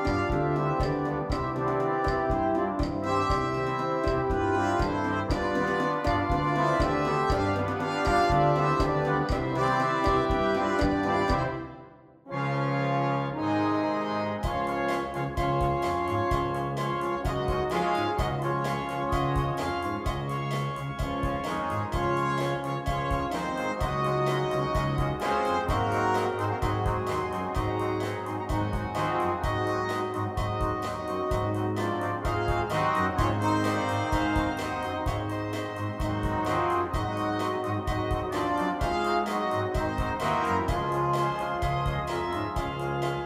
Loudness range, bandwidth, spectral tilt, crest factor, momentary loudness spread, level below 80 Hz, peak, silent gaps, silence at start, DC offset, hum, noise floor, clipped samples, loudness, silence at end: 4 LU; 15.5 kHz; -6.5 dB/octave; 16 dB; 5 LU; -38 dBFS; -12 dBFS; none; 0 s; under 0.1%; none; -50 dBFS; under 0.1%; -28 LUFS; 0 s